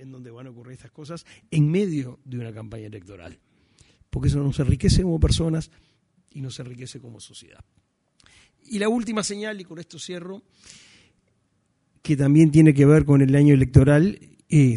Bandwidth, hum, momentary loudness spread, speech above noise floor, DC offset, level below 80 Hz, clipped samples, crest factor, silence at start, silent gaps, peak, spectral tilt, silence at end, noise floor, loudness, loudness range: 11 kHz; none; 26 LU; 48 dB; under 0.1%; -36 dBFS; under 0.1%; 22 dB; 0.05 s; none; 0 dBFS; -7 dB/octave; 0 s; -69 dBFS; -19 LUFS; 14 LU